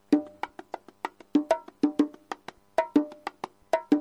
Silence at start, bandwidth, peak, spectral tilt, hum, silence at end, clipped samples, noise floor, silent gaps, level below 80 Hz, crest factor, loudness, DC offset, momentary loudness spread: 0.1 s; 11 kHz; -10 dBFS; -5.5 dB/octave; none; 0 s; under 0.1%; -43 dBFS; none; -70 dBFS; 20 dB; -29 LUFS; under 0.1%; 15 LU